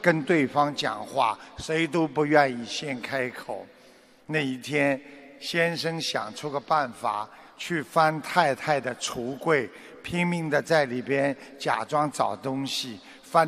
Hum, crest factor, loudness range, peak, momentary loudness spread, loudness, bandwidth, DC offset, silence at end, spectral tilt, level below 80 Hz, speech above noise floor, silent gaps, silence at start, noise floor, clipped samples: none; 22 dB; 3 LU; -4 dBFS; 10 LU; -26 LUFS; 15 kHz; under 0.1%; 0 s; -4.5 dB/octave; -64 dBFS; 28 dB; none; 0 s; -55 dBFS; under 0.1%